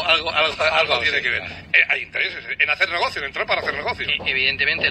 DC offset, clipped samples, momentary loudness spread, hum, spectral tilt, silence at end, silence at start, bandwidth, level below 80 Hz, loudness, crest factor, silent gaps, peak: under 0.1%; under 0.1%; 7 LU; none; -2.5 dB/octave; 0 s; 0 s; 13.5 kHz; -50 dBFS; -19 LUFS; 20 dB; none; 0 dBFS